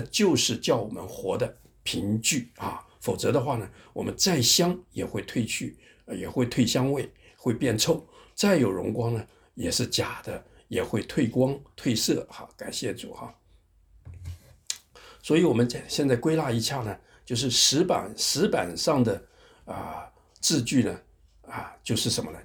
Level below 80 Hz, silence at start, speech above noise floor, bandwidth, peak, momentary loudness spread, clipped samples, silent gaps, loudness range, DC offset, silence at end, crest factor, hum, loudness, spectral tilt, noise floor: -56 dBFS; 0 s; 34 dB; over 20 kHz; -6 dBFS; 17 LU; under 0.1%; none; 5 LU; under 0.1%; 0 s; 20 dB; none; -26 LUFS; -4 dB/octave; -60 dBFS